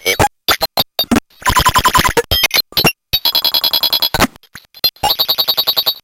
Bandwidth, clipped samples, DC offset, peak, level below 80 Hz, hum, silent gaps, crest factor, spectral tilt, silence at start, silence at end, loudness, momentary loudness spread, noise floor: 17 kHz; under 0.1%; under 0.1%; 0 dBFS; -32 dBFS; none; none; 14 dB; -2.5 dB/octave; 0.05 s; 0.05 s; -13 LUFS; 4 LU; -40 dBFS